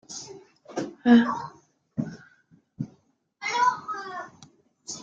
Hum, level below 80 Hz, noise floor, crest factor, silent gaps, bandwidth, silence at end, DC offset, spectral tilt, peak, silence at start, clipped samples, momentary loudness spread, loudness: none; -70 dBFS; -64 dBFS; 22 dB; none; 7.8 kHz; 0 s; under 0.1%; -4.5 dB/octave; -6 dBFS; 0.1 s; under 0.1%; 21 LU; -26 LUFS